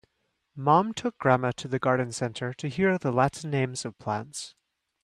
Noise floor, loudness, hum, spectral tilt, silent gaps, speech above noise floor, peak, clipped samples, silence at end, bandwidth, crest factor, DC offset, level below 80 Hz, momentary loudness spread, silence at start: -76 dBFS; -27 LUFS; none; -5.5 dB/octave; none; 50 dB; -6 dBFS; under 0.1%; 0.55 s; 12.5 kHz; 22 dB; under 0.1%; -62 dBFS; 10 LU; 0.55 s